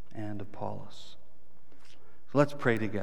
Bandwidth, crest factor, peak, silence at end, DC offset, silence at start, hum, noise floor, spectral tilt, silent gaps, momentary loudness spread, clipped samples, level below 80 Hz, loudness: 20 kHz; 24 dB; -10 dBFS; 0 s; 2%; 0.15 s; none; -64 dBFS; -7 dB/octave; none; 22 LU; under 0.1%; -68 dBFS; -32 LUFS